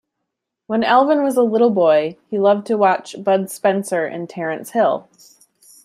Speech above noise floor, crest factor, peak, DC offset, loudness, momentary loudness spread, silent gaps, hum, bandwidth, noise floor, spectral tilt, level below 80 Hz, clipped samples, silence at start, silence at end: 62 dB; 16 dB; -2 dBFS; under 0.1%; -17 LUFS; 10 LU; none; none; 15 kHz; -79 dBFS; -5.5 dB/octave; -68 dBFS; under 0.1%; 0.7 s; 0.85 s